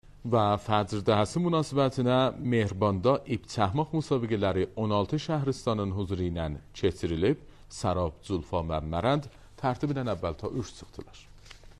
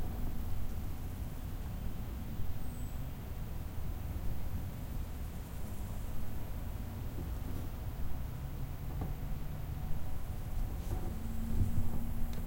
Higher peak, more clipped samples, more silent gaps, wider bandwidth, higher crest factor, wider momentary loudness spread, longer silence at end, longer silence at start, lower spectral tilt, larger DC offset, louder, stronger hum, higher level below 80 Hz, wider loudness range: first, -10 dBFS vs -20 dBFS; neither; neither; second, 12 kHz vs 16.5 kHz; about the same, 20 dB vs 16 dB; first, 9 LU vs 3 LU; about the same, 0.05 s vs 0 s; about the same, 0.05 s vs 0 s; about the same, -6.5 dB/octave vs -6.5 dB/octave; neither; first, -29 LUFS vs -42 LUFS; neither; second, -48 dBFS vs -40 dBFS; about the same, 5 LU vs 3 LU